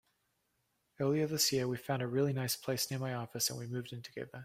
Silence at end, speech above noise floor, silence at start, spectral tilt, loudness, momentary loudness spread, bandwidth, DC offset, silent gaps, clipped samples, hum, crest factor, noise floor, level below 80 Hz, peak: 0 s; 44 dB; 1 s; -4 dB/octave; -35 LUFS; 11 LU; 16 kHz; under 0.1%; none; under 0.1%; none; 18 dB; -80 dBFS; -72 dBFS; -18 dBFS